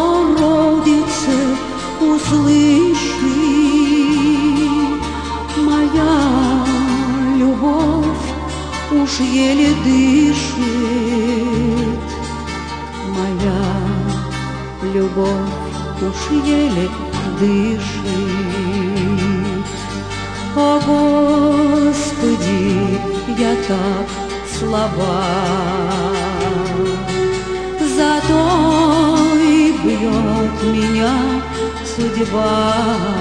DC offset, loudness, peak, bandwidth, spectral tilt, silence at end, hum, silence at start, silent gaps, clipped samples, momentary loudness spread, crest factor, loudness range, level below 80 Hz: 0.3%; -16 LUFS; -4 dBFS; 10 kHz; -5.5 dB/octave; 0 s; none; 0 s; none; under 0.1%; 10 LU; 12 dB; 5 LU; -32 dBFS